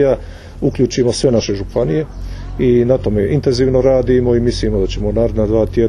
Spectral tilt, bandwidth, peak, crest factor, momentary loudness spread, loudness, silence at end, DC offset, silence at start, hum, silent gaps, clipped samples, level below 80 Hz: -7 dB/octave; 11 kHz; 0 dBFS; 14 dB; 8 LU; -15 LUFS; 0 s; under 0.1%; 0 s; none; none; under 0.1%; -26 dBFS